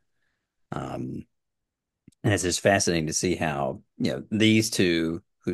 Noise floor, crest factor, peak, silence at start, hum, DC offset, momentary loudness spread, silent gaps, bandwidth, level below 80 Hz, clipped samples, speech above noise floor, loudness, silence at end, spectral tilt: -84 dBFS; 20 dB; -6 dBFS; 0.7 s; none; under 0.1%; 14 LU; none; 12.5 kHz; -54 dBFS; under 0.1%; 60 dB; -25 LUFS; 0 s; -4 dB/octave